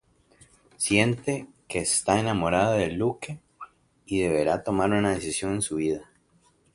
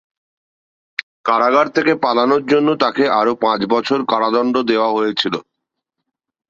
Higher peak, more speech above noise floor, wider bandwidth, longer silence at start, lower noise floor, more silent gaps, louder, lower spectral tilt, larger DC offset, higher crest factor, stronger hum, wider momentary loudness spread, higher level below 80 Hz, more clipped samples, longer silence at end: about the same, -4 dBFS vs -2 dBFS; second, 39 dB vs 62 dB; first, 11.5 kHz vs 7.6 kHz; second, 0.8 s vs 1 s; second, -64 dBFS vs -78 dBFS; second, none vs 1.03-1.24 s; second, -25 LUFS vs -16 LUFS; about the same, -4.5 dB/octave vs -5.5 dB/octave; neither; first, 22 dB vs 16 dB; neither; first, 14 LU vs 8 LU; first, -52 dBFS vs -62 dBFS; neither; second, 0.7 s vs 1.1 s